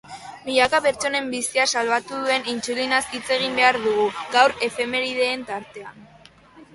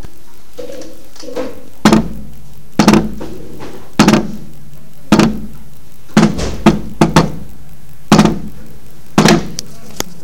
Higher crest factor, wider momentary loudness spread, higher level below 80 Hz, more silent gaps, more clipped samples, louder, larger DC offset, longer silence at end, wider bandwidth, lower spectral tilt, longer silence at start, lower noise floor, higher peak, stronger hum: about the same, 20 dB vs 16 dB; second, 14 LU vs 22 LU; second, -60 dBFS vs -32 dBFS; neither; second, under 0.1% vs 0.5%; second, -21 LUFS vs -13 LUFS; second, under 0.1% vs 10%; about the same, 0.1 s vs 0.15 s; second, 12 kHz vs 17 kHz; second, -1.5 dB/octave vs -5.5 dB/octave; about the same, 0.05 s vs 0 s; first, -49 dBFS vs -42 dBFS; second, -4 dBFS vs 0 dBFS; neither